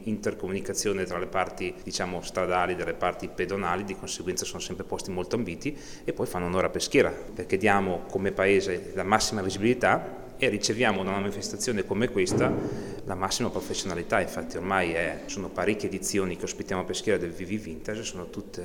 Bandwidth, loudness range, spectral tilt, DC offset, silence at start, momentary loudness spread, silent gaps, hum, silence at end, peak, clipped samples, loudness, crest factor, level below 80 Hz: 18.5 kHz; 5 LU; -4 dB/octave; under 0.1%; 0 s; 10 LU; none; none; 0 s; -4 dBFS; under 0.1%; -28 LUFS; 24 dB; -48 dBFS